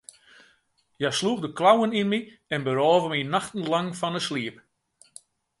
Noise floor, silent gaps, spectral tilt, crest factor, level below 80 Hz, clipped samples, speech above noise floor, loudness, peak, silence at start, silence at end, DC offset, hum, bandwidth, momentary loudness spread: -67 dBFS; none; -4.5 dB/octave; 20 dB; -70 dBFS; under 0.1%; 43 dB; -25 LUFS; -6 dBFS; 1 s; 1.05 s; under 0.1%; none; 11.5 kHz; 10 LU